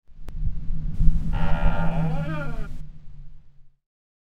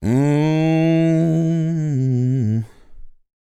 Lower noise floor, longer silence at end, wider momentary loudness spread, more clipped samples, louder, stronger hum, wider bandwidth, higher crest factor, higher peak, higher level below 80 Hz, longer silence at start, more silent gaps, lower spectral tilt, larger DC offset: first, -45 dBFS vs -37 dBFS; about the same, 0.5 s vs 0.45 s; first, 19 LU vs 5 LU; neither; second, -28 LUFS vs -18 LUFS; neither; second, 3.6 kHz vs 8.6 kHz; first, 20 dB vs 12 dB; first, -2 dBFS vs -6 dBFS; first, -26 dBFS vs -46 dBFS; about the same, 0.05 s vs 0 s; neither; about the same, -8.5 dB/octave vs -8.5 dB/octave; neither